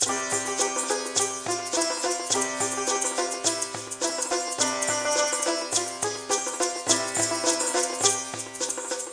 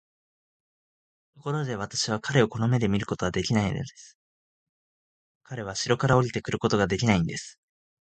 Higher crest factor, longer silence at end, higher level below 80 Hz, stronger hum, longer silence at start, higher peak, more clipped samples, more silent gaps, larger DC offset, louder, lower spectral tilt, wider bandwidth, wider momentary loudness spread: about the same, 20 dB vs 22 dB; second, 0 s vs 0.55 s; second, -68 dBFS vs -52 dBFS; neither; second, 0 s vs 1.4 s; about the same, -6 dBFS vs -6 dBFS; neither; second, none vs 4.15-5.41 s; neither; about the same, -25 LUFS vs -26 LUFS; second, -0.5 dB/octave vs -5.5 dB/octave; first, 10.5 kHz vs 9.2 kHz; second, 6 LU vs 14 LU